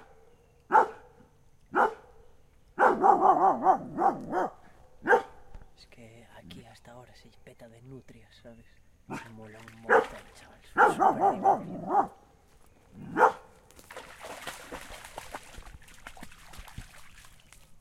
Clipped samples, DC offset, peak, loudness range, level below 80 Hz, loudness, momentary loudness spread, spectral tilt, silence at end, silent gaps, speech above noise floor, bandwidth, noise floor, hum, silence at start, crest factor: under 0.1%; under 0.1%; -6 dBFS; 19 LU; -58 dBFS; -26 LUFS; 26 LU; -5 dB/octave; 0.05 s; none; 30 dB; 15 kHz; -59 dBFS; none; 0.7 s; 24 dB